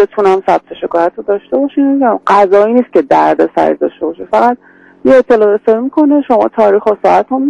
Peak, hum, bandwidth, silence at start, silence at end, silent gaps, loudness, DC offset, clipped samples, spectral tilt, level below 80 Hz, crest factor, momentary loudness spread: 0 dBFS; none; 9.4 kHz; 0 s; 0 s; none; -10 LUFS; under 0.1%; 0.2%; -7 dB/octave; -50 dBFS; 10 dB; 7 LU